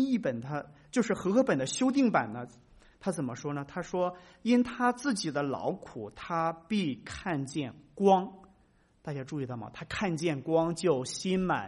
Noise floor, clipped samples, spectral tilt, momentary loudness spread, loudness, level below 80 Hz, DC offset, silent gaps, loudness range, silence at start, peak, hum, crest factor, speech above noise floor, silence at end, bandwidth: -66 dBFS; under 0.1%; -5.5 dB/octave; 13 LU; -31 LUFS; -62 dBFS; under 0.1%; none; 2 LU; 0 s; -12 dBFS; none; 20 dB; 35 dB; 0 s; 11.5 kHz